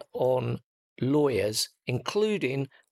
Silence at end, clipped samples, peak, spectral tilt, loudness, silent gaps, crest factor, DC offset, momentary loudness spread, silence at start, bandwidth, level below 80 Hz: 0.25 s; under 0.1%; -14 dBFS; -5 dB/octave; -28 LUFS; 0.64-0.96 s; 14 dB; under 0.1%; 9 LU; 0 s; 16 kHz; -66 dBFS